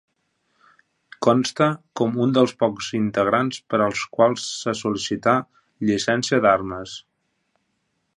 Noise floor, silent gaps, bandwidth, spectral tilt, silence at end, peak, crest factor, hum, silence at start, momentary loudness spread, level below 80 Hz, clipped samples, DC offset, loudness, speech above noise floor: -72 dBFS; none; 11.5 kHz; -5 dB/octave; 1.15 s; -2 dBFS; 20 dB; none; 1.2 s; 7 LU; -58 dBFS; under 0.1%; under 0.1%; -21 LUFS; 52 dB